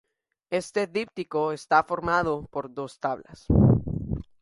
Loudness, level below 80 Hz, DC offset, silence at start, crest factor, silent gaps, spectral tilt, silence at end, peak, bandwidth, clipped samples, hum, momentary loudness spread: -26 LUFS; -40 dBFS; under 0.1%; 0.5 s; 20 dB; none; -7.5 dB/octave; 0.2 s; -6 dBFS; 11.5 kHz; under 0.1%; none; 13 LU